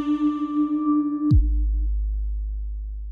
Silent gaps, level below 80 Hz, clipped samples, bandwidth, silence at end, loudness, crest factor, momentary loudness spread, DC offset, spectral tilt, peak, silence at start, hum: none; -26 dBFS; under 0.1%; 4.2 kHz; 0 s; -24 LUFS; 14 dB; 12 LU; under 0.1%; -10.5 dB/octave; -10 dBFS; 0 s; none